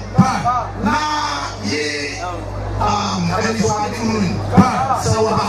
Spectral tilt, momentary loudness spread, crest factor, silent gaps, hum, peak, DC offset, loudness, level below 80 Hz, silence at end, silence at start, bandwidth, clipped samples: -5 dB/octave; 8 LU; 18 dB; none; none; 0 dBFS; under 0.1%; -18 LUFS; -34 dBFS; 0 s; 0 s; 14 kHz; under 0.1%